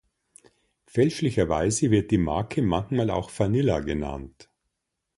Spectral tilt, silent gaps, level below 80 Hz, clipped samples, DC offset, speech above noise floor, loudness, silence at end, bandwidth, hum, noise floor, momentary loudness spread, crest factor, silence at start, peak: -6 dB/octave; none; -44 dBFS; under 0.1%; under 0.1%; 57 dB; -25 LUFS; 0.9 s; 11.5 kHz; none; -81 dBFS; 8 LU; 18 dB; 0.95 s; -8 dBFS